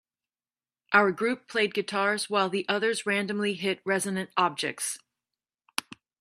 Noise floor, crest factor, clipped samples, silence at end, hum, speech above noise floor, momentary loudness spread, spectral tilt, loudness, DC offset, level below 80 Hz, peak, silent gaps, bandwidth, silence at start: under -90 dBFS; 24 dB; under 0.1%; 1.25 s; none; over 63 dB; 10 LU; -3.5 dB/octave; -27 LUFS; under 0.1%; -78 dBFS; -6 dBFS; none; 14 kHz; 0.9 s